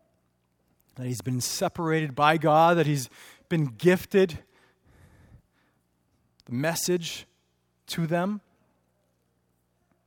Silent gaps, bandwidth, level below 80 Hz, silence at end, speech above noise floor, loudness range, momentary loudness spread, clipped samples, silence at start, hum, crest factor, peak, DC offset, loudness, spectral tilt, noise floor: none; 18 kHz; -64 dBFS; 1.65 s; 47 dB; 9 LU; 15 LU; under 0.1%; 0.95 s; 60 Hz at -55 dBFS; 24 dB; -4 dBFS; under 0.1%; -25 LUFS; -5 dB/octave; -72 dBFS